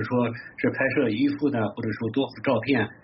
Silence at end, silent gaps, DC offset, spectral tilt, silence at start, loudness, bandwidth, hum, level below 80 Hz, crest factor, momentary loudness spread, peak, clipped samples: 0.1 s; none; under 0.1%; -5.5 dB/octave; 0 s; -25 LUFS; 5.8 kHz; none; -62 dBFS; 16 dB; 5 LU; -10 dBFS; under 0.1%